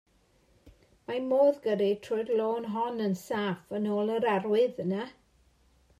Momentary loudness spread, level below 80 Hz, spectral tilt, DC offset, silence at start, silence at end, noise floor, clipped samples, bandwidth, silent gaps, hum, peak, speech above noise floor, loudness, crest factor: 10 LU; -68 dBFS; -6.5 dB/octave; under 0.1%; 0.65 s; 0.9 s; -66 dBFS; under 0.1%; 13.5 kHz; none; none; -14 dBFS; 37 dB; -29 LUFS; 16 dB